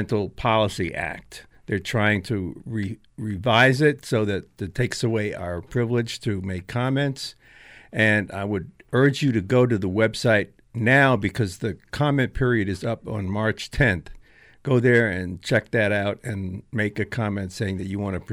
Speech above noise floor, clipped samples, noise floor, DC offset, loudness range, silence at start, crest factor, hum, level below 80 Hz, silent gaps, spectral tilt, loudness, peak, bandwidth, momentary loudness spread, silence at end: 26 dB; under 0.1%; -49 dBFS; under 0.1%; 5 LU; 0 s; 18 dB; none; -46 dBFS; none; -6 dB/octave; -23 LUFS; -4 dBFS; 15 kHz; 12 LU; 0 s